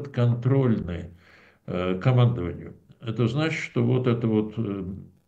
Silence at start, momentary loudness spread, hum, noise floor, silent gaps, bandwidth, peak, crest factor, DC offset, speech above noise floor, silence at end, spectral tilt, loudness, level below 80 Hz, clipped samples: 0 s; 15 LU; none; -48 dBFS; none; 7.6 kHz; -8 dBFS; 18 dB; under 0.1%; 23 dB; 0.25 s; -8.5 dB/octave; -25 LUFS; -52 dBFS; under 0.1%